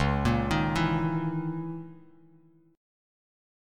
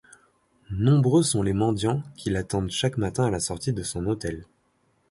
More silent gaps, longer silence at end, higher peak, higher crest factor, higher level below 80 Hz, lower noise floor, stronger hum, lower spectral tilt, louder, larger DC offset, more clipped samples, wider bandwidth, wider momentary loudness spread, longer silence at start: neither; first, 1 s vs 0.65 s; about the same, -12 dBFS vs -10 dBFS; about the same, 18 dB vs 16 dB; about the same, -42 dBFS vs -46 dBFS; second, -60 dBFS vs -67 dBFS; neither; first, -7 dB/octave vs -5.5 dB/octave; second, -28 LUFS vs -25 LUFS; neither; neither; first, 13.5 kHz vs 11.5 kHz; first, 13 LU vs 9 LU; second, 0 s vs 0.7 s